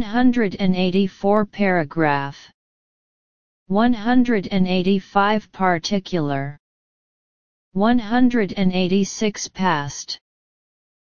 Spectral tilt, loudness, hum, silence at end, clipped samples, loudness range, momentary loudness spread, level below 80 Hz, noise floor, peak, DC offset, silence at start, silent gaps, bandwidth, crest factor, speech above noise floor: -5.5 dB/octave; -20 LUFS; none; 0.8 s; under 0.1%; 2 LU; 7 LU; -48 dBFS; under -90 dBFS; -2 dBFS; 2%; 0 s; 2.54-3.66 s, 6.59-7.71 s; 7.2 kHz; 18 dB; over 71 dB